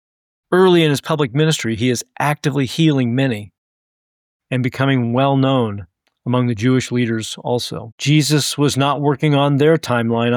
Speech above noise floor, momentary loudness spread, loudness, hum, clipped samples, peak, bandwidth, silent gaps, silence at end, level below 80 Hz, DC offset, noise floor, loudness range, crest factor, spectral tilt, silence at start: over 74 dB; 8 LU; -17 LUFS; none; under 0.1%; -4 dBFS; 18 kHz; 3.58-4.40 s, 7.92-7.98 s; 0 s; -56 dBFS; under 0.1%; under -90 dBFS; 3 LU; 14 dB; -5.5 dB/octave; 0.5 s